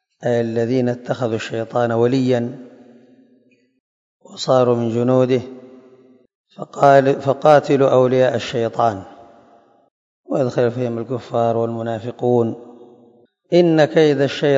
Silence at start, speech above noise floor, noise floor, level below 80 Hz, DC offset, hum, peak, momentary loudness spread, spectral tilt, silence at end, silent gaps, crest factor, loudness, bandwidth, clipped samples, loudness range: 0.2 s; 40 dB; -57 dBFS; -64 dBFS; under 0.1%; none; 0 dBFS; 12 LU; -7 dB/octave; 0 s; 3.80-4.20 s, 6.35-6.45 s, 9.91-10.24 s; 18 dB; -17 LUFS; 7.8 kHz; under 0.1%; 6 LU